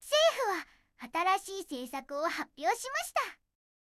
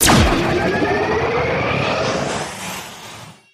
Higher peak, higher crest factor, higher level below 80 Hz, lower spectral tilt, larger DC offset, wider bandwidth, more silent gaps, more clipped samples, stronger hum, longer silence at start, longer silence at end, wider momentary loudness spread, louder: second, -16 dBFS vs -2 dBFS; about the same, 18 dB vs 16 dB; second, -72 dBFS vs -32 dBFS; second, 0 dB/octave vs -4 dB/octave; neither; about the same, 16 kHz vs 15.5 kHz; neither; neither; neither; about the same, 0 s vs 0 s; first, 0.55 s vs 0.2 s; second, 13 LU vs 17 LU; second, -32 LUFS vs -18 LUFS